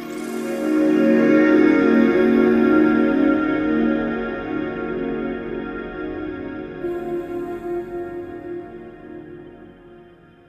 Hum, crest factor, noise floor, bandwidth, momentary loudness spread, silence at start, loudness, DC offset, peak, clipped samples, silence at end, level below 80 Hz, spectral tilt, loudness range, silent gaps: none; 16 dB; -47 dBFS; 12 kHz; 18 LU; 0 s; -19 LUFS; under 0.1%; -4 dBFS; under 0.1%; 0.45 s; -48 dBFS; -7 dB/octave; 14 LU; none